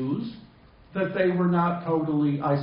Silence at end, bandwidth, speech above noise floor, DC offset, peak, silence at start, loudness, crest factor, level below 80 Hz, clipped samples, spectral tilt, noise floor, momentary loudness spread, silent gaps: 0 s; 5.2 kHz; 27 dB; under 0.1%; -10 dBFS; 0 s; -25 LUFS; 16 dB; -60 dBFS; under 0.1%; -7.5 dB/octave; -52 dBFS; 10 LU; none